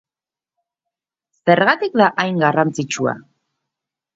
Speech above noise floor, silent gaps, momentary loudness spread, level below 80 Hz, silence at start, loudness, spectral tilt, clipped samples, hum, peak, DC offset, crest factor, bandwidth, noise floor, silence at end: over 74 dB; none; 9 LU; -66 dBFS; 1.45 s; -17 LUFS; -5 dB/octave; under 0.1%; none; 0 dBFS; under 0.1%; 20 dB; 7.8 kHz; under -90 dBFS; 0.95 s